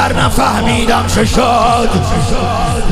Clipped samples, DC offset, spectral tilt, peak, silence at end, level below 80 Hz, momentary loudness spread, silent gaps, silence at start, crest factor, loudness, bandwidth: under 0.1%; under 0.1%; -5 dB/octave; 0 dBFS; 0 s; -20 dBFS; 4 LU; none; 0 s; 10 dB; -12 LUFS; 15.5 kHz